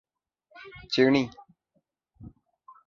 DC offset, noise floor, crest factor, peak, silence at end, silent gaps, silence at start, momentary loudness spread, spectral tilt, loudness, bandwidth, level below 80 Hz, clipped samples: under 0.1%; -75 dBFS; 24 dB; -8 dBFS; 0.6 s; none; 0.6 s; 25 LU; -6 dB/octave; -25 LUFS; 7.2 kHz; -62 dBFS; under 0.1%